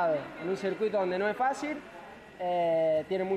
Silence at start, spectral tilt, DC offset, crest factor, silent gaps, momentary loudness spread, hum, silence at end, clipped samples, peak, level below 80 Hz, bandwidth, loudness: 0 s; -6 dB/octave; under 0.1%; 12 dB; none; 14 LU; none; 0 s; under 0.1%; -18 dBFS; -68 dBFS; 11 kHz; -30 LUFS